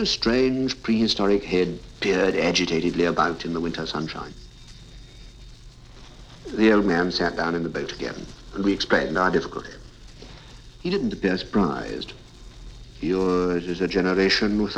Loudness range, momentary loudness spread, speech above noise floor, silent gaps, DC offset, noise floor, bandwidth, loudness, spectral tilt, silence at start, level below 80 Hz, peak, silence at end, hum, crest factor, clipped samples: 6 LU; 16 LU; 22 dB; none; under 0.1%; -44 dBFS; 9.8 kHz; -23 LUFS; -5 dB/octave; 0 s; -44 dBFS; -6 dBFS; 0 s; none; 18 dB; under 0.1%